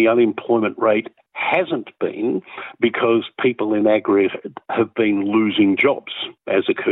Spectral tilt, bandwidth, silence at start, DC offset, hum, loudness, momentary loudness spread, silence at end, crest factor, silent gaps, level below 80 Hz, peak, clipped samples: -9 dB/octave; 4 kHz; 0 s; under 0.1%; none; -19 LUFS; 10 LU; 0 s; 14 dB; none; -74 dBFS; -4 dBFS; under 0.1%